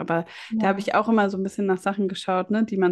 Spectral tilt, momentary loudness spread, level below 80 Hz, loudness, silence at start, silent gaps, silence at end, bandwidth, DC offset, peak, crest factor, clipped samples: -6.5 dB/octave; 6 LU; -66 dBFS; -24 LUFS; 0 s; none; 0 s; 12 kHz; under 0.1%; -8 dBFS; 16 dB; under 0.1%